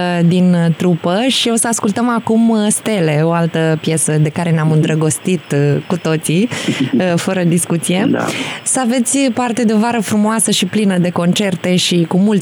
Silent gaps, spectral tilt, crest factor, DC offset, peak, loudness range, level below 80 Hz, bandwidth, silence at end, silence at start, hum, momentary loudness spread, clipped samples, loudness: none; -5 dB/octave; 10 dB; under 0.1%; -4 dBFS; 2 LU; -66 dBFS; over 20 kHz; 0 s; 0 s; none; 3 LU; under 0.1%; -14 LUFS